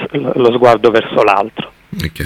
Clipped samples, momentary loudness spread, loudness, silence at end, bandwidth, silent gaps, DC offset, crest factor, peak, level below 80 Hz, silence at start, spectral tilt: 0.5%; 15 LU; -11 LUFS; 0 s; 16 kHz; none; under 0.1%; 12 dB; 0 dBFS; -42 dBFS; 0 s; -6.5 dB/octave